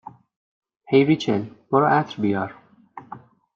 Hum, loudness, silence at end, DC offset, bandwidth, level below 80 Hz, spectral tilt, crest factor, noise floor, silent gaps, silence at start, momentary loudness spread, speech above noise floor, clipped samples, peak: none; -21 LUFS; 0.4 s; under 0.1%; 7.4 kHz; -66 dBFS; -7 dB/octave; 18 dB; -45 dBFS; none; 0.9 s; 22 LU; 25 dB; under 0.1%; -4 dBFS